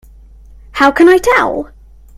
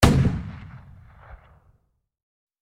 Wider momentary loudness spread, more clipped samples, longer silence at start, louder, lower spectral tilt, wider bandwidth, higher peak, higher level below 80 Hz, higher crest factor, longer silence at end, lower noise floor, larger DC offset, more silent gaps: second, 18 LU vs 28 LU; first, 0.1% vs under 0.1%; first, 0.75 s vs 0 s; first, -10 LUFS vs -23 LUFS; second, -4 dB/octave vs -6 dB/octave; about the same, 15.5 kHz vs 16 kHz; about the same, 0 dBFS vs 0 dBFS; about the same, -38 dBFS vs -34 dBFS; second, 12 dB vs 26 dB; second, 0.5 s vs 1.25 s; second, -38 dBFS vs -64 dBFS; neither; neither